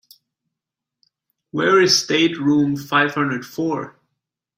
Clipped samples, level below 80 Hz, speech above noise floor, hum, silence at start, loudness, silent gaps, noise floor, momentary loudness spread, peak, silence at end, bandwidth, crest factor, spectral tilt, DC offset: under 0.1%; -62 dBFS; 67 dB; none; 1.55 s; -18 LUFS; none; -85 dBFS; 12 LU; 0 dBFS; 0.7 s; 16 kHz; 20 dB; -4 dB/octave; under 0.1%